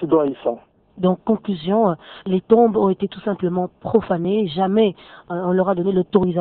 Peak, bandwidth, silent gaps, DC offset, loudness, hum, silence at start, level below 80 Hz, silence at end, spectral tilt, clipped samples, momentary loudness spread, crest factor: -2 dBFS; 4.4 kHz; none; under 0.1%; -20 LUFS; none; 0 s; -54 dBFS; 0 s; -12 dB/octave; under 0.1%; 8 LU; 16 dB